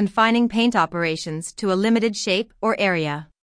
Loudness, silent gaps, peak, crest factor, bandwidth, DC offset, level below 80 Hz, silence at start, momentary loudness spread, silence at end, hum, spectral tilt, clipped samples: -21 LUFS; none; -6 dBFS; 16 dB; 10.5 kHz; under 0.1%; -56 dBFS; 0 s; 9 LU; 0.3 s; none; -4.5 dB/octave; under 0.1%